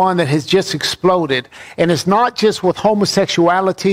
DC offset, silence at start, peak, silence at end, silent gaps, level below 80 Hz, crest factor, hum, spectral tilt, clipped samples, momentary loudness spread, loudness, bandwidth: under 0.1%; 0 s; -2 dBFS; 0 s; none; -52 dBFS; 12 dB; none; -5 dB/octave; under 0.1%; 5 LU; -15 LUFS; 16 kHz